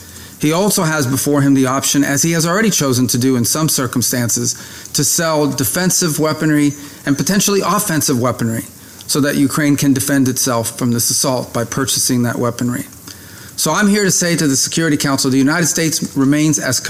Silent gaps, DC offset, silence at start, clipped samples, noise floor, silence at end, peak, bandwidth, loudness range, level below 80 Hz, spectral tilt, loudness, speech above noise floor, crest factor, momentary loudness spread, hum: none; under 0.1%; 0 s; under 0.1%; -35 dBFS; 0 s; -4 dBFS; 16 kHz; 2 LU; -50 dBFS; -4 dB/octave; -14 LUFS; 20 dB; 12 dB; 7 LU; none